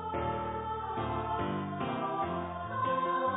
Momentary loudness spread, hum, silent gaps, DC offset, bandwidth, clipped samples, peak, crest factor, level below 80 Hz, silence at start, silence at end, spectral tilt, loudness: 5 LU; none; none; under 0.1%; 3.9 kHz; under 0.1%; -20 dBFS; 14 dB; -52 dBFS; 0 s; 0 s; -3 dB/octave; -34 LUFS